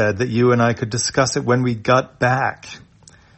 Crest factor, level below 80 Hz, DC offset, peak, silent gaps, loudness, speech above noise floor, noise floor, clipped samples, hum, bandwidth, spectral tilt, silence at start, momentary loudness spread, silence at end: 18 dB; -52 dBFS; under 0.1%; -2 dBFS; none; -18 LUFS; 31 dB; -49 dBFS; under 0.1%; none; 8.6 kHz; -5 dB/octave; 0 s; 6 LU; 0.6 s